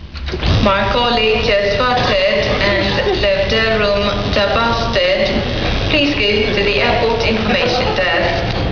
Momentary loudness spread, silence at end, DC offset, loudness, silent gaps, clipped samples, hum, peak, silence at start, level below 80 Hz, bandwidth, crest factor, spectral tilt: 3 LU; 0 s; 0.7%; -14 LUFS; none; under 0.1%; none; 0 dBFS; 0 s; -26 dBFS; 5.4 kHz; 14 dB; -5.5 dB/octave